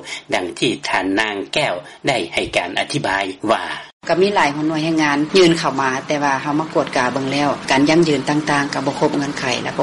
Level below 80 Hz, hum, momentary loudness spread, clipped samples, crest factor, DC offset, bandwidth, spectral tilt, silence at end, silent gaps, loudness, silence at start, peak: -52 dBFS; none; 7 LU; under 0.1%; 16 dB; under 0.1%; 11.5 kHz; -4.5 dB/octave; 0 s; 3.93-4.01 s; -18 LUFS; 0 s; -2 dBFS